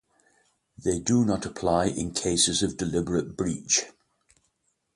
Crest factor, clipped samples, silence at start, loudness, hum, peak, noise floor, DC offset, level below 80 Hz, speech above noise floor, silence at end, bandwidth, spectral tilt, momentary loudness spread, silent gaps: 20 dB; under 0.1%; 0.8 s; -26 LUFS; none; -8 dBFS; -74 dBFS; under 0.1%; -50 dBFS; 48 dB; 1.05 s; 11.5 kHz; -3.5 dB/octave; 8 LU; none